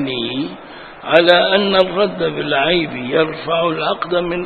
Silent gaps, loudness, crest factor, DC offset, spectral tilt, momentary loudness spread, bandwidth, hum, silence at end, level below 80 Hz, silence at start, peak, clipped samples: none; -16 LUFS; 16 dB; 0.2%; -7 dB/octave; 13 LU; 6.8 kHz; none; 0 s; -48 dBFS; 0 s; 0 dBFS; under 0.1%